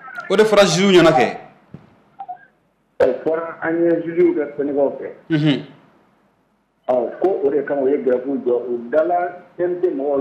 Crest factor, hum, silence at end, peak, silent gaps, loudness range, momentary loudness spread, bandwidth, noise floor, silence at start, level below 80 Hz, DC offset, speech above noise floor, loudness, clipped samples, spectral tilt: 14 dB; none; 0 s; -4 dBFS; none; 4 LU; 14 LU; 13 kHz; -63 dBFS; 0.05 s; -56 dBFS; under 0.1%; 46 dB; -18 LUFS; under 0.1%; -5.5 dB/octave